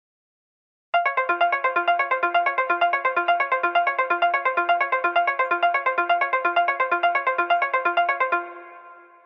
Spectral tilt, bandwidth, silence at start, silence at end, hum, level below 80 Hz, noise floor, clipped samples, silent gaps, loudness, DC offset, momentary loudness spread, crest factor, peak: -3.5 dB/octave; 5.8 kHz; 0.95 s; 0.25 s; none; under -90 dBFS; -46 dBFS; under 0.1%; none; -21 LUFS; under 0.1%; 2 LU; 14 dB; -8 dBFS